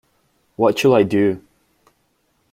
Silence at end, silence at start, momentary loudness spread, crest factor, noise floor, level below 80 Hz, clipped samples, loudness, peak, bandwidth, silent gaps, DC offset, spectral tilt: 1.15 s; 0.6 s; 6 LU; 18 dB; -65 dBFS; -60 dBFS; under 0.1%; -17 LUFS; -2 dBFS; 15.5 kHz; none; under 0.1%; -6 dB/octave